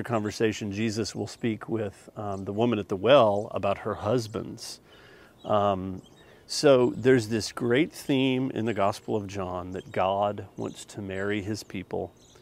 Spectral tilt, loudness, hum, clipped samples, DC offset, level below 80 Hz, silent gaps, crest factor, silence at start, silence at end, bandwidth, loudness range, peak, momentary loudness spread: -5.5 dB/octave; -27 LUFS; none; under 0.1%; under 0.1%; -62 dBFS; none; 22 dB; 0 s; 0.3 s; 16 kHz; 5 LU; -6 dBFS; 15 LU